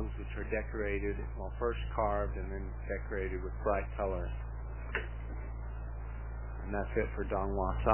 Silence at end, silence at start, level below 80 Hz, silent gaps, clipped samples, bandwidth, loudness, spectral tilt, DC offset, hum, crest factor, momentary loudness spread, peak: 0 s; 0 s; -40 dBFS; none; under 0.1%; 3.2 kHz; -37 LUFS; -6.5 dB/octave; 0.2%; none; 24 dB; 10 LU; -12 dBFS